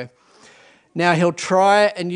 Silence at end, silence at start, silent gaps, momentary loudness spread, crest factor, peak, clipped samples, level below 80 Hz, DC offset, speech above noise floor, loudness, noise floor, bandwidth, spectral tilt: 0 s; 0 s; none; 16 LU; 18 dB; 0 dBFS; under 0.1%; -66 dBFS; under 0.1%; 34 dB; -17 LUFS; -50 dBFS; 10.5 kHz; -5 dB/octave